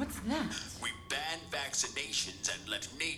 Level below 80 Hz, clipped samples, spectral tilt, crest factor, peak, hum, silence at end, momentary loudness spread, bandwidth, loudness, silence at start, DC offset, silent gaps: -56 dBFS; under 0.1%; -1.5 dB/octave; 20 dB; -16 dBFS; none; 0 s; 5 LU; 20 kHz; -35 LUFS; 0 s; under 0.1%; none